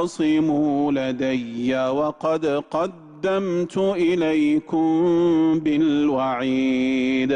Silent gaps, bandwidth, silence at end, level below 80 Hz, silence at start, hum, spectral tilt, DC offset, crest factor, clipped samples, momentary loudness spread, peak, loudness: none; 9.8 kHz; 0 s; -58 dBFS; 0 s; none; -6.5 dB/octave; under 0.1%; 8 dB; under 0.1%; 6 LU; -12 dBFS; -21 LUFS